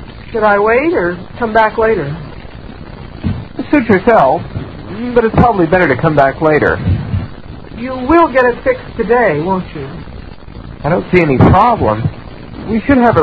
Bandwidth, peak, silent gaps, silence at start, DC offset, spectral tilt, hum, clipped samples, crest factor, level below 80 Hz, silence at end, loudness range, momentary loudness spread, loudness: 6.6 kHz; 0 dBFS; none; 0 s; under 0.1%; -9.5 dB/octave; none; 0.2%; 12 dB; -30 dBFS; 0 s; 3 LU; 21 LU; -12 LUFS